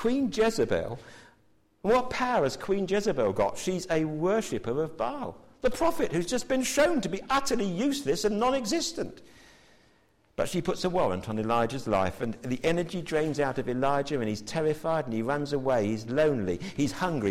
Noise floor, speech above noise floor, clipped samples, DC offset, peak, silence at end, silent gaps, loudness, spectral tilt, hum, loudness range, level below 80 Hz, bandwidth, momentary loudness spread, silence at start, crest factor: -65 dBFS; 38 dB; under 0.1%; under 0.1%; -14 dBFS; 0 s; none; -28 LUFS; -5 dB/octave; none; 3 LU; -50 dBFS; 16 kHz; 6 LU; 0 s; 14 dB